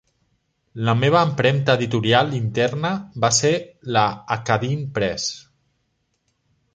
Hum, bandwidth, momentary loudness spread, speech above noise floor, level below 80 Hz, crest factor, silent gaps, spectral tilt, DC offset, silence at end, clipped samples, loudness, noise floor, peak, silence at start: none; 9.6 kHz; 9 LU; 51 dB; -54 dBFS; 20 dB; none; -4.5 dB/octave; under 0.1%; 1.35 s; under 0.1%; -20 LUFS; -70 dBFS; -2 dBFS; 0.75 s